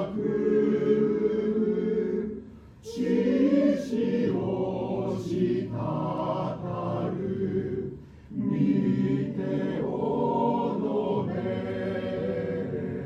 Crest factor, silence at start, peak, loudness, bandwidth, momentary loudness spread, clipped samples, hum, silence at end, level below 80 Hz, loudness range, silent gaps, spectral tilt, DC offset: 14 dB; 0 s; -12 dBFS; -27 LUFS; 8.4 kHz; 8 LU; under 0.1%; none; 0 s; -56 dBFS; 3 LU; none; -8.5 dB/octave; under 0.1%